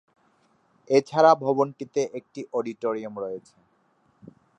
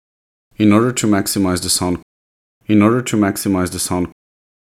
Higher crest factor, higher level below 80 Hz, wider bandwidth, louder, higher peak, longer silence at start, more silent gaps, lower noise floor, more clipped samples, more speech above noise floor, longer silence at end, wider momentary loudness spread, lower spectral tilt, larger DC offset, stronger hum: first, 22 dB vs 16 dB; second, -78 dBFS vs -46 dBFS; second, 8.8 kHz vs 16 kHz; second, -24 LUFS vs -16 LUFS; second, -4 dBFS vs 0 dBFS; first, 0.9 s vs 0.6 s; second, none vs 2.02-2.61 s; second, -66 dBFS vs under -90 dBFS; neither; second, 42 dB vs over 75 dB; first, 1.2 s vs 0.5 s; first, 16 LU vs 9 LU; about the same, -5.5 dB/octave vs -4.5 dB/octave; neither; neither